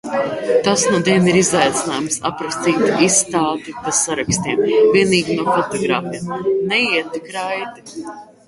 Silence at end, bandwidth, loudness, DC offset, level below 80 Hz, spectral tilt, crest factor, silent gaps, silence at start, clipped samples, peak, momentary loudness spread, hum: 0.25 s; 11.5 kHz; -17 LUFS; under 0.1%; -52 dBFS; -3.5 dB/octave; 16 dB; none; 0.05 s; under 0.1%; 0 dBFS; 12 LU; none